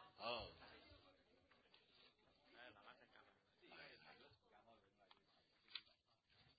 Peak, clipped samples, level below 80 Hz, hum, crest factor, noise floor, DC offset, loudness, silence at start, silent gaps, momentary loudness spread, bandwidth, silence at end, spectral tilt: -32 dBFS; under 0.1%; -82 dBFS; none; 30 dB; -80 dBFS; under 0.1%; -57 LUFS; 0 s; none; 17 LU; 4.8 kHz; 0 s; -0.5 dB/octave